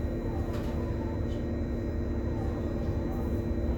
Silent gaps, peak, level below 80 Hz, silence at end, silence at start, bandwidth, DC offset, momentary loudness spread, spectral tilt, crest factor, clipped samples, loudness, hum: none; -20 dBFS; -36 dBFS; 0 s; 0 s; 18 kHz; under 0.1%; 1 LU; -9 dB/octave; 12 dB; under 0.1%; -33 LUFS; none